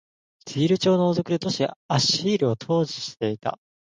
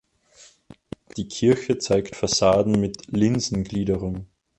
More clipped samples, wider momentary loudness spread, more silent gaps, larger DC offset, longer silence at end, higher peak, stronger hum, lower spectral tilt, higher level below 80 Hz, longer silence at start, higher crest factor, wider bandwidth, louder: neither; second, 8 LU vs 16 LU; first, 1.76-1.89 s vs none; neither; about the same, 0.4 s vs 0.35 s; about the same, -8 dBFS vs -6 dBFS; neither; about the same, -5 dB/octave vs -5 dB/octave; second, -64 dBFS vs -46 dBFS; second, 0.45 s vs 1.15 s; about the same, 16 dB vs 18 dB; second, 9.8 kHz vs 11 kHz; about the same, -23 LUFS vs -22 LUFS